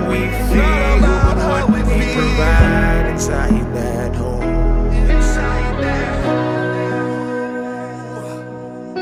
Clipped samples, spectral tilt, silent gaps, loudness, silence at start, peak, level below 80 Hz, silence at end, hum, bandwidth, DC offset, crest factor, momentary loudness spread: under 0.1%; -6.5 dB/octave; none; -17 LUFS; 0 s; 0 dBFS; -18 dBFS; 0 s; none; 13.5 kHz; under 0.1%; 14 dB; 14 LU